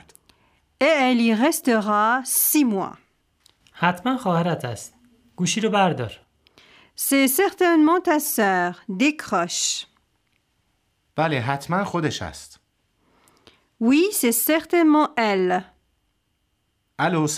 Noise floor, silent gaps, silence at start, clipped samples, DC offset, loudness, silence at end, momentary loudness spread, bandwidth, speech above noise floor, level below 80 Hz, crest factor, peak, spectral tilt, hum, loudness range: -71 dBFS; none; 0.8 s; under 0.1%; under 0.1%; -20 LUFS; 0 s; 11 LU; 16 kHz; 50 dB; -62 dBFS; 20 dB; -4 dBFS; -4 dB/octave; none; 6 LU